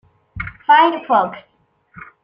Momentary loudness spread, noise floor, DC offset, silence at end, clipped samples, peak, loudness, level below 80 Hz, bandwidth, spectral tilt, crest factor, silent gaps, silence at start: 17 LU; -45 dBFS; under 0.1%; 0.25 s; under 0.1%; -2 dBFS; -15 LUFS; -46 dBFS; 5.4 kHz; -7.5 dB/octave; 16 dB; none; 0.35 s